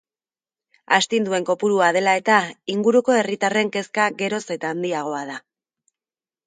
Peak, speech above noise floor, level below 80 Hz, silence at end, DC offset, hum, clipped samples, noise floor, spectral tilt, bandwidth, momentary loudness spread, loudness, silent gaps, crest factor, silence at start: 0 dBFS; over 70 dB; -72 dBFS; 1.1 s; under 0.1%; none; under 0.1%; under -90 dBFS; -4 dB/octave; 9.6 kHz; 9 LU; -20 LUFS; none; 22 dB; 0.9 s